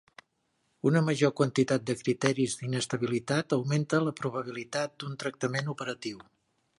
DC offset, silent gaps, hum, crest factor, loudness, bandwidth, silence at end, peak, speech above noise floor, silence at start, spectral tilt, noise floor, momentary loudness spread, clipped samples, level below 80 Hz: under 0.1%; none; none; 24 dB; -30 LUFS; 11.5 kHz; 0.55 s; -6 dBFS; 46 dB; 0.85 s; -5.5 dB/octave; -76 dBFS; 10 LU; under 0.1%; -72 dBFS